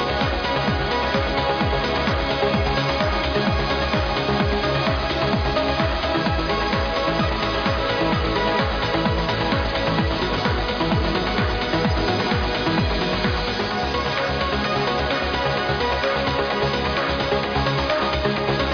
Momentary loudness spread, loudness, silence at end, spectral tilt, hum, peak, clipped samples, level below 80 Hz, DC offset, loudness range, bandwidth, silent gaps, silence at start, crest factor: 1 LU; -21 LUFS; 0 s; -6 dB/octave; none; -8 dBFS; under 0.1%; -30 dBFS; under 0.1%; 1 LU; 5.4 kHz; none; 0 s; 14 dB